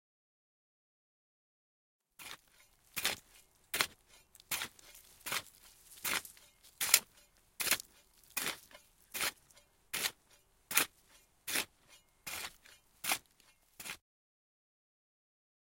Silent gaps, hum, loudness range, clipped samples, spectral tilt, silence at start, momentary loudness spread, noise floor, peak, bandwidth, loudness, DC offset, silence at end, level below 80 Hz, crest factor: none; none; 8 LU; under 0.1%; 1 dB/octave; 2.2 s; 19 LU; -69 dBFS; -6 dBFS; 16.5 kHz; -36 LUFS; under 0.1%; 1.7 s; -74 dBFS; 36 dB